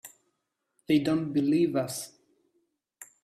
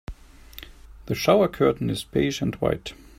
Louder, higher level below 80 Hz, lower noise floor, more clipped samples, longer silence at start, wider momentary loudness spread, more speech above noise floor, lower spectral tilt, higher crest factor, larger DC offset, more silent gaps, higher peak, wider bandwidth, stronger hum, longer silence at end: second, -27 LUFS vs -23 LUFS; second, -70 dBFS vs -44 dBFS; first, -80 dBFS vs -45 dBFS; neither; about the same, 0.05 s vs 0.1 s; second, 11 LU vs 23 LU; first, 54 dB vs 23 dB; about the same, -5.5 dB/octave vs -6 dB/octave; about the same, 18 dB vs 18 dB; neither; neither; second, -12 dBFS vs -6 dBFS; second, 14.5 kHz vs 16 kHz; neither; about the same, 0.2 s vs 0.25 s